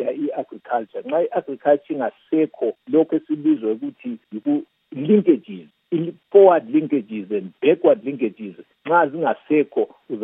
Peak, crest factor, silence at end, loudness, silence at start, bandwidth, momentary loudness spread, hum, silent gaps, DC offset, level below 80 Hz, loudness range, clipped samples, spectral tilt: 0 dBFS; 20 dB; 0 s; -20 LUFS; 0 s; 3.9 kHz; 13 LU; none; none; under 0.1%; -82 dBFS; 4 LU; under 0.1%; -11 dB/octave